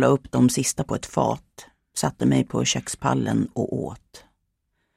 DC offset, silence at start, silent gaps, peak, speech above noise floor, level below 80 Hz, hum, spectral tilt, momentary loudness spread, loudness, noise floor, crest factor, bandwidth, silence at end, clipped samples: under 0.1%; 0 s; none; -6 dBFS; 51 dB; -52 dBFS; none; -5 dB/octave; 11 LU; -24 LUFS; -74 dBFS; 18 dB; 15.5 kHz; 0.8 s; under 0.1%